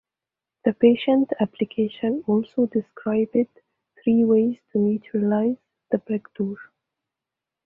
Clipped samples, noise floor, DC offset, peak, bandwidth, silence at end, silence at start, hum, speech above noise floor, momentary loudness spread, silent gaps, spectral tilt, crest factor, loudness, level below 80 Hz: under 0.1%; -88 dBFS; under 0.1%; -4 dBFS; 4 kHz; 1.05 s; 0.65 s; none; 67 dB; 11 LU; none; -10.5 dB/octave; 18 dB; -23 LUFS; -66 dBFS